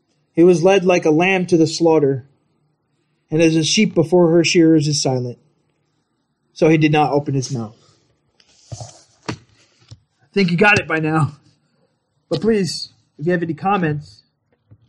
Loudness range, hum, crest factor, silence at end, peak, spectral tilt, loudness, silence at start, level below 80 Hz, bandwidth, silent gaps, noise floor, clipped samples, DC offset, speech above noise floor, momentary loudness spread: 6 LU; none; 16 dB; 0.85 s; -2 dBFS; -5.5 dB/octave; -16 LUFS; 0.35 s; -56 dBFS; 11 kHz; none; -68 dBFS; under 0.1%; under 0.1%; 53 dB; 18 LU